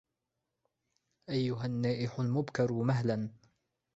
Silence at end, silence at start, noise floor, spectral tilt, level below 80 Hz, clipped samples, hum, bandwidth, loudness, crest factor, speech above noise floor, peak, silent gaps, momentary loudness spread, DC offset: 0.6 s; 1.3 s; -86 dBFS; -7.5 dB/octave; -68 dBFS; under 0.1%; none; 7.8 kHz; -33 LUFS; 18 dB; 54 dB; -16 dBFS; none; 6 LU; under 0.1%